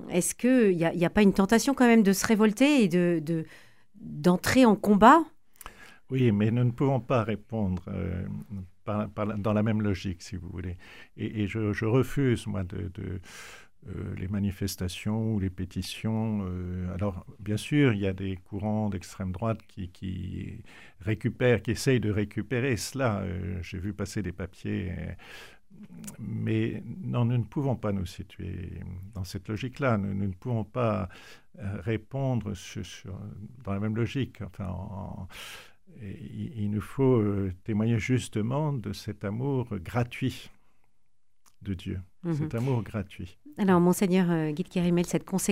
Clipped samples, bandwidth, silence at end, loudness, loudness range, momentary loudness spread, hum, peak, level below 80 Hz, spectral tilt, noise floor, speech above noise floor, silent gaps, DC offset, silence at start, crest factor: under 0.1%; 16 kHz; 0 s; -28 LUFS; 11 LU; 18 LU; none; -6 dBFS; -52 dBFS; -6.5 dB/octave; -75 dBFS; 47 dB; none; 0.2%; 0 s; 22 dB